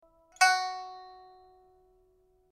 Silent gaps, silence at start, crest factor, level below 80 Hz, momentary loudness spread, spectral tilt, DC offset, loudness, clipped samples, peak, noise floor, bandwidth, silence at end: none; 0.4 s; 24 dB; -74 dBFS; 25 LU; 2.5 dB/octave; under 0.1%; -26 LUFS; under 0.1%; -10 dBFS; -67 dBFS; 14 kHz; 1.4 s